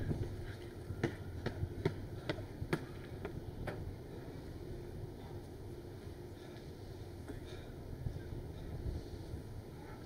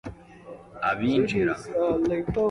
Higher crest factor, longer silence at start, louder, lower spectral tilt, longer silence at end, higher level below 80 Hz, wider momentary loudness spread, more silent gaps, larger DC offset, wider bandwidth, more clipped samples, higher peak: first, 24 dB vs 16 dB; about the same, 0 s vs 0.05 s; second, -45 LUFS vs -25 LUFS; about the same, -7 dB/octave vs -7 dB/octave; about the same, 0 s vs 0 s; about the same, -52 dBFS vs -48 dBFS; second, 9 LU vs 20 LU; neither; neither; first, 16 kHz vs 11 kHz; neither; second, -20 dBFS vs -10 dBFS